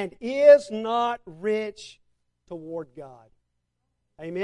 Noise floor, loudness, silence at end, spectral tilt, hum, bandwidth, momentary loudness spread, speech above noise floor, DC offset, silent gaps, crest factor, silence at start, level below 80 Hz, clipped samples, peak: -77 dBFS; -21 LUFS; 0 s; -5 dB/octave; 60 Hz at -70 dBFS; 10 kHz; 26 LU; 54 dB; under 0.1%; none; 20 dB; 0 s; -68 dBFS; under 0.1%; -4 dBFS